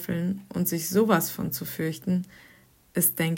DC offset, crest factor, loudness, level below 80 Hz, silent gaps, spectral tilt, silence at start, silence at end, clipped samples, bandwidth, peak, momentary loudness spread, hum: under 0.1%; 18 dB; -26 LUFS; -62 dBFS; none; -5 dB/octave; 0 s; 0 s; under 0.1%; 16.5 kHz; -10 dBFS; 8 LU; none